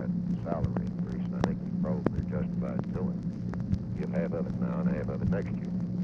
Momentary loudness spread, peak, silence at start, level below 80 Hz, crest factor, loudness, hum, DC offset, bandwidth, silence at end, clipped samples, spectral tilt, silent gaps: 3 LU; -8 dBFS; 0 s; -46 dBFS; 24 dB; -32 LUFS; none; under 0.1%; 6.4 kHz; 0 s; under 0.1%; -9.5 dB/octave; none